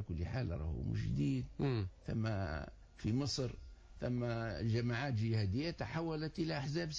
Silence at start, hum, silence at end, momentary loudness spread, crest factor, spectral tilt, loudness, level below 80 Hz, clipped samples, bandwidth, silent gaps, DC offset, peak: 0 s; none; 0 s; 7 LU; 12 dB; -6.5 dB/octave; -39 LUFS; -50 dBFS; under 0.1%; 7.8 kHz; none; under 0.1%; -26 dBFS